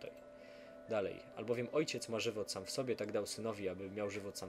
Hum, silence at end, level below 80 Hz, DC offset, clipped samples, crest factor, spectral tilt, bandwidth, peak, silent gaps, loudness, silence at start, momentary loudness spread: none; 0 s; -76 dBFS; under 0.1%; under 0.1%; 18 dB; -4 dB/octave; 16 kHz; -24 dBFS; none; -40 LUFS; 0 s; 17 LU